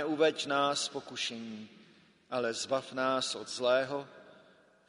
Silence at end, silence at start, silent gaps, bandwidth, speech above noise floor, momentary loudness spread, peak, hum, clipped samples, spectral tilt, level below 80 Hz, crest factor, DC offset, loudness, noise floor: 0.55 s; 0 s; none; 10.5 kHz; 30 dB; 15 LU; -14 dBFS; none; under 0.1%; -2.5 dB/octave; -80 dBFS; 20 dB; under 0.1%; -32 LUFS; -62 dBFS